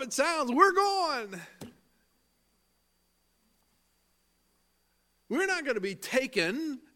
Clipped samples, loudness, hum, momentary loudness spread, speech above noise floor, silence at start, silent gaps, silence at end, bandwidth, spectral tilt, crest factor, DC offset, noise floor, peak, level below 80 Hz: under 0.1%; -28 LUFS; none; 13 LU; 44 dB; 0 s; none; 0.15 s; 17.5 kHz; -3 dB/octave; 24 dB; under 0.1%; -73 dBFS; -8 dBFS; -74 dBFS